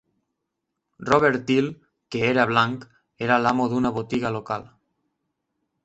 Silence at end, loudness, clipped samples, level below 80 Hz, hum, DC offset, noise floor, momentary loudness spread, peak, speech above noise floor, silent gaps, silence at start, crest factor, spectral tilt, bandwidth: 1.2 s; -23 LUFS; under 0.1%; -58 dBFS; none; under 0.1%; -81 dBFS; 13 LU; -4 dBFS; 59 dB; none; 1 s; 22 dB; -6 dB/octave; 8.2 kHz